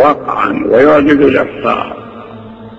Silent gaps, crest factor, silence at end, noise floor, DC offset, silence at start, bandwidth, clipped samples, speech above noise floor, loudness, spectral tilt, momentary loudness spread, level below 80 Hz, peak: none; 12 dB; 0 s; -30 dBFS; under 0.1%; 0 s; 7.6 kHz; under 0.1%; 21 dB; -10 LUFS; -7.5 dB/octave; 23 LU; -42 dBFS; 0 dBFS